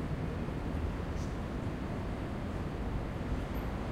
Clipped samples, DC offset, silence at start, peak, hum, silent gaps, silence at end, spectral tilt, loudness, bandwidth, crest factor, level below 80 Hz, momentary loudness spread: under 0.1%; under 0.1%; 0 s; -24 dBFS; none; none; 0 s; -7.5 dB/octave; -38 LUFS; 15 kHz; 12 dB; -42 dBFS; 1 LU